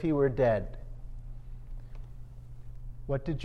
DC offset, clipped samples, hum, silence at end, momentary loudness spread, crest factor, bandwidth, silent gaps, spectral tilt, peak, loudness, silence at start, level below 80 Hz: under 0.1%; under 0.1%; none; 0 s; 22 LU; 18 dB; 6.2 kHz; none; -9 dB/octave; -14 dBFS; -30 LUFS; 0 s; -42 dBFS